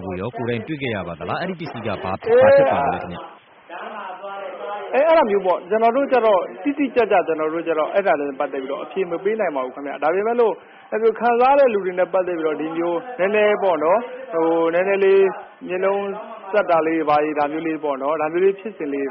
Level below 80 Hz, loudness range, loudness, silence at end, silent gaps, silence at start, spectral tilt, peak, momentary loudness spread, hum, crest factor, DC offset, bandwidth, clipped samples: -60 dBFS; 3 LU; -20 LUFS; 0 s; none; 0 s; -4 dB/octave; -2 dBFS; 13 LU; none; 16 dB; under 0.1%; 5.8 kHz; under 0.1%